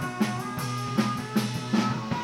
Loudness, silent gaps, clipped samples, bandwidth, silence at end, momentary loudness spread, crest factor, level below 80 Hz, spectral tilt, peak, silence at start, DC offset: -28 LUFS; none; under 0.1%; 16.5 kHz; 0 s; 5 LU; 16 dB; -58 dBFS; -5.5 dB/octave; -12 dBFS; 0 s; under 0.1%